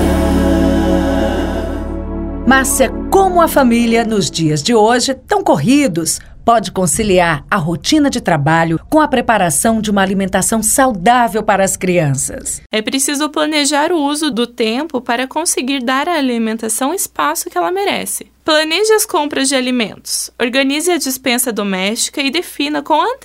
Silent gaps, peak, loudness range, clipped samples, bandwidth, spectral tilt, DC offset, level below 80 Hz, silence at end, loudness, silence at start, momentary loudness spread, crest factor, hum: 12.66-12.70 s; 0 dBFS; 3 LU; under 0.1%; 16.5 kHz; -3.5 dB/octave; under 0.1%; -30 dBFS; 0.05 s; -14 LUFS; 0 s; 7 LU; 14 dB; none